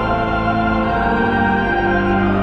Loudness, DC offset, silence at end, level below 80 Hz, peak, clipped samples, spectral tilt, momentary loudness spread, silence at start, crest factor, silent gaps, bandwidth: -17 LUFS; under 0.1%; 0 s; -30 dBFS; -4 dBFS; under 0.1%; -8.5 dB/octave; 2 LU; 0 s; 12 dB; none; 6.6 kHz